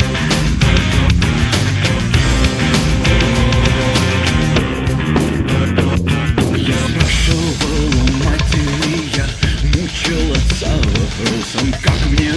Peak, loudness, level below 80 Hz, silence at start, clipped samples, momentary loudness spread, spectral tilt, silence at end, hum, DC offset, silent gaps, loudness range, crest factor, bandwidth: 0 dBFS; -15 LUFS; -20 dBFS; 0 s; under 0.1%; 4 LU; -5 dB/octave; 0 s; none; under 0.1%; none; 2 LU; 14 dB; 11 kHz